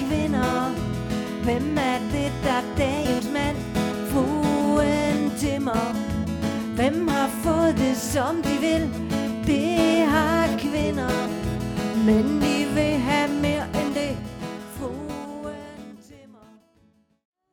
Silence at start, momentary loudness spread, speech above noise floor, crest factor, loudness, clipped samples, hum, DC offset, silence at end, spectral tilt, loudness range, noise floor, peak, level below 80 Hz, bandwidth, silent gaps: 0 s; 12 LU; 39 dB; 16 dB; -24 LUFS; under 0.1%; none; under 0.1%; 1.3 s; -5.5 dB/octave; 5 LU; -61 dBFS; -8 dBFS; -40 dBFS; 19 kHz; none